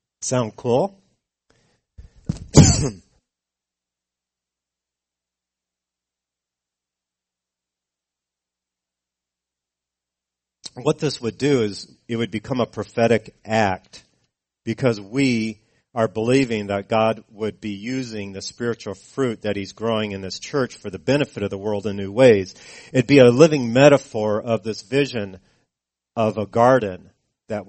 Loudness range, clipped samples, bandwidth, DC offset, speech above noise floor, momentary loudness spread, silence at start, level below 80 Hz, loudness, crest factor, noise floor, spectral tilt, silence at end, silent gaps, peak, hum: 10 LU; under 0.1%; 8.8 kHz; under 0.1%; 67 dB; 17 LU; 0.2 s; -44 dBFS; -20 LUFS; 22 dB; -87 dBFS; -5.5 dB/octave; 0.05 s; none; 0 dBFS; none